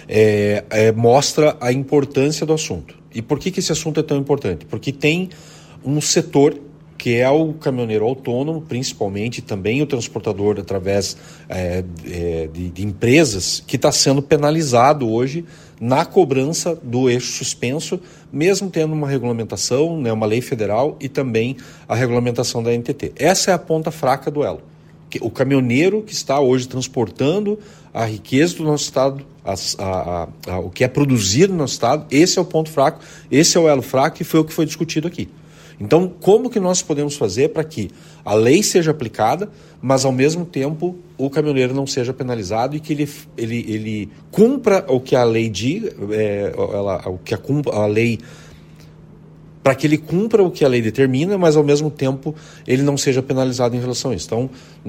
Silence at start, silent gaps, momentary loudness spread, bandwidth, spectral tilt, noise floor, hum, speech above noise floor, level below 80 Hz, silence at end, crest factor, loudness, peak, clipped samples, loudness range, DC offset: 0 s; none; 12 LU; 16.5 kHz; -5 dB/octave; -42 dBFS; none; 24 dB; -50 dBFS; 0 s; 18 dB; -18 LUFS; 0 dBFS; under 0.1%; 5 LU; under 0.1%